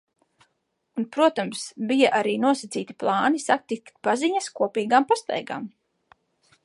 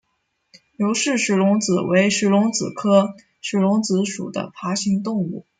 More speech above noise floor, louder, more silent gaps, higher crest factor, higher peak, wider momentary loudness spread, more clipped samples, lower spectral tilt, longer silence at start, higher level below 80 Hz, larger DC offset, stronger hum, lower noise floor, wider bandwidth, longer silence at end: about the same, 51 dB vs 52 dB; second, -24 LUFS vs -20 LUFS; neither; about the same, 20 dB vs 16 dB; about the same, -4 dBFS vs -4 dBFS; first, 12 LU vs 9 LU; neither; about the same, -4 dB/octave vs -5 dB/octave; first, 0.95 s vs 0.8 s; second, -78 dBFS vs -64 dBFS; neither; neither; about the same, -75 dBFS vs -72 dBFS; first, 11.5 kHz vs 9.4 kHz; first, 0.95 s vs 0.2 s